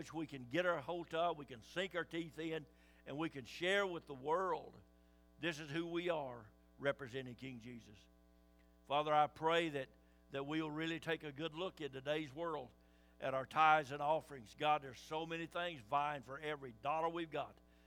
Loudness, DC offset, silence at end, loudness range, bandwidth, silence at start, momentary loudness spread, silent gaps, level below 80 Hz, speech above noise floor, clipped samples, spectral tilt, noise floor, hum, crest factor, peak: -41 LUFS; under 0.1%; 0.35 s; 6 LU; 16.5 kHz; 0 s; 14 LU; none; -72 dBFS; 27 dB; under 0.1%; -5 dB/octave; -68 dBFS; none; 24 dB; -18 dBFS